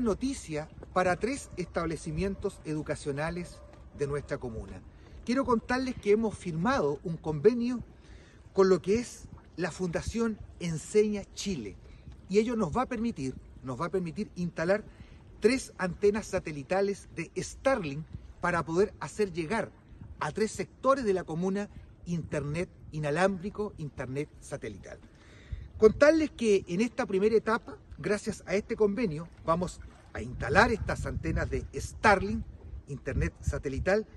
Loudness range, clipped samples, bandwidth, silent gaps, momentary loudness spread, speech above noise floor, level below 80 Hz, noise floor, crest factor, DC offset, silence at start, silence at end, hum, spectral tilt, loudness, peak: 6 LU; under 0.1%; 12 kHz; none; 15 LU; 22 dB; -46 dBFS; -52 dBFS; 24 dB; under 0.1%; 0 s; 0.1 s; none; -6 dB/octave; -30 LUFS; -8 dBFS